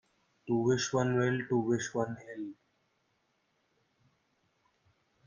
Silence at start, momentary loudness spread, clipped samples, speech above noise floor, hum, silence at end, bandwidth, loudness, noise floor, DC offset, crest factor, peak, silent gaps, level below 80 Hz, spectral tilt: 0.45 s; 14 LU; under 0.1%; 45 dB; none; 2.75 s; 9.6 kHz; -31 LUFS; -76 dBFS; under 0.1%; 18 dB; -16 dBFS; none; -72 dBFS; -5.5 dB/octave